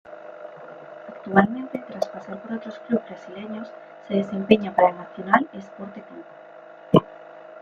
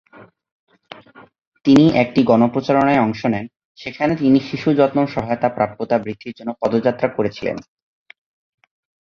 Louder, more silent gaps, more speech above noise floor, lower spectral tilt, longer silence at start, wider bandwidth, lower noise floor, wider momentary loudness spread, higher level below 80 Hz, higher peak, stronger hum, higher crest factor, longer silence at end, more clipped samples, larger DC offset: second, -23 LUFS vs -18 LUFS; second, none vs 0.52-0.67 s, 1.47-1.52 s, 3.65-3.75 s; second, 19 dB vs 25 dB; about the same, -8 dB/octave vs -7.5 dB/octave; about the same, 0.1 s vs 0.2 s; about the same, 7 kHz vs 7.4 kHz; about the same, -43 dBFS vs -42 dBFS; first, 23 LU vs 14 LU; second, -62 dBFS vs -54 dBFS; about the same, 0 dBFS vs 0 dBFS; neither; first, 24 dB vs 18 dB; second, 0 s vs 1.4 s; neither; neither